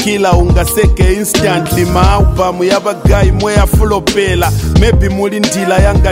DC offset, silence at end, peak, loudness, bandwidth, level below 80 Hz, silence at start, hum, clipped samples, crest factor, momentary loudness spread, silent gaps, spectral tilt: 0.2%; 0 s; 0 dBFS; -11 LUFS; 16.5 kHz; -14 dBFS; 0 s; none; under 0.1%; 10 dB; 3 LU; none; -5.5 dB/octave